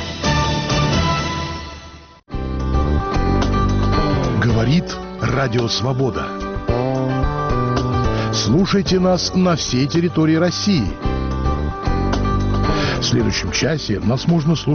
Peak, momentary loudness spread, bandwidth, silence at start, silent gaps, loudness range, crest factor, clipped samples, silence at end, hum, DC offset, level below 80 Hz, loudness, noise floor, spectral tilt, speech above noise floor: -6 dBFS; 7 LU; 6.8 kHz; 0 s; none; 3 LU; 12 dB; under 0.1%; 0 s; none; under 0.1%; -26 dBFS; -18 LUFS; -40 dBFS; -5.5 dB/octave; 23 dB